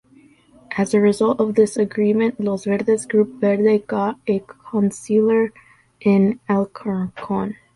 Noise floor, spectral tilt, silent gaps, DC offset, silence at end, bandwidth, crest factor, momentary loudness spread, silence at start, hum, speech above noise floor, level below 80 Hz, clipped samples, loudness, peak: -51 dBFS; -7 dB/octave; none; under 0.1%; 0.25 s; 11.5 kHz; 16 dB; 8 LU; 0.7 s; none; 33 dB; -58 dBFS; under 0.1%; -19 LUFS; -4 dBFS